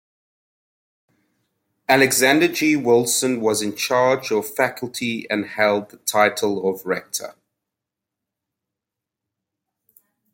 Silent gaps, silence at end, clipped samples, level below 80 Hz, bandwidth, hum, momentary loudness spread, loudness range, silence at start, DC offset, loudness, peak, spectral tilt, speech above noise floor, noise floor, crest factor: none; 3 s; under 0.1%; -68 dBFS; 17 kHz; none; 10 LU; 11 LU; 1.9 s; under 0.1%; -19 LUFS; -2 dBFS; -3 dB/octave; 66 dB; -85 dBFS; 20 dB